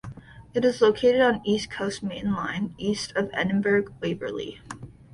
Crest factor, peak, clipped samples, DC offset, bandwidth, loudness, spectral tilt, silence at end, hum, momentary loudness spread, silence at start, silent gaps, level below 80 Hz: 18 dB; -8 dBFS; under 0.1%; under 0.1%; 11.5 kHz; -25 LUFS; -5.5 dB/octave; 0.25 s; none; 16 LU; 0.05 s; none; -54 dBFS